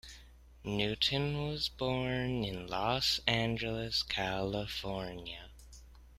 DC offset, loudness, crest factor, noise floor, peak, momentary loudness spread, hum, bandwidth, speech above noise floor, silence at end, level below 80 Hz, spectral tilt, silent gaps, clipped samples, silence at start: under 0.1%; -34 LUFS; 24 dB; -56 dBFS; -12 dBFS; 14 LU; none; 15.5 kHz; 21 dB; 0 s; -52 dBFS; -4.5 dB/octave; none; under 0.1%; 0.05 s